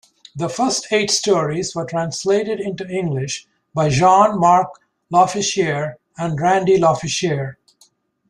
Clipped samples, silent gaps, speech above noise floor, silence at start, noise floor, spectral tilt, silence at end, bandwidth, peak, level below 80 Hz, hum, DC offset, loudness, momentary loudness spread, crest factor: under 0.1%; none; 40 dB; 0.35 s; -57 dBFS; -4.5 dB/octave; 0.75 s; 12 kHz; -2 dBFS; -54 dBFS; none; under 0.1%; -18 LUFS; 14 LU; 16 dB